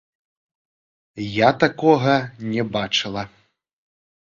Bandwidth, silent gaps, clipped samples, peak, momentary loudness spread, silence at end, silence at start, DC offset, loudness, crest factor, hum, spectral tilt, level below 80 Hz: 7.6 kHz; none; under 0.1%; 0 dBFS; 14 LU; 0.95 s; 1.15 s; under 0.1%; -20 LUFS; 22 dB; none; -5.5 dB/octave; -56 dBFS